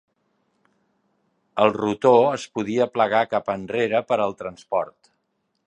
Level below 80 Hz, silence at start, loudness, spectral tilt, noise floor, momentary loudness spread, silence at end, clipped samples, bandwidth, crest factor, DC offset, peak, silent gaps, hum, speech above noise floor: -64 dBFS; 1.55 s; -22 LUFS; -5.5 dB/octave; -73 dBFS; 10 LU; 0.75 s; under 0.1%; 9.8 kHz; 20 dB; under 0.1%; -2 dBFS; none; none; 52 dB